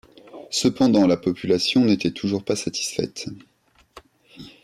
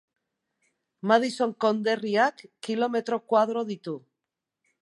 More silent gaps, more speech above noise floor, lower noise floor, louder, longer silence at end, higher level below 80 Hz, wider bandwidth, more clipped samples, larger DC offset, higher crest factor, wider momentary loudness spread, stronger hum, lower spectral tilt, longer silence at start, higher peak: neither; second, 29 dB vs 61 dB; second, -50 dBFS vs -86 dBFS; first, -21 LUFS vs -26 LUFS; second, 0.15 s vs 0.85 s; first, -58 dBFS vs -82 dBFS; first, 13.5 kHz vs 11.5 kHz; neither; neither; second, 16 dB vs 22 dB; about the same, 10 LU vs 12 LU; neither; about the same, -4.5 dB/octave vs -5 dB/octave; second, 0.35 s vs 1.05 s; about the same, -6 dBFS vs -6 dBFS